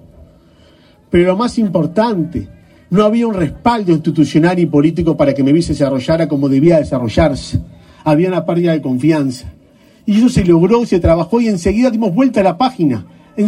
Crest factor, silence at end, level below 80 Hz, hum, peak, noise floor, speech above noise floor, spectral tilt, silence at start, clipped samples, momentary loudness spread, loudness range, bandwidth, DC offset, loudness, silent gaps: 12 dB; 0 s; -34 dBFS; none; 0 dBFS; -46 dBFS; 34 dB; -7.5 dB/octave; 1.1 s; under 0.1%; 7 LU; 3 LU; 12 kHz; under 0.1%; -13 LUFS; none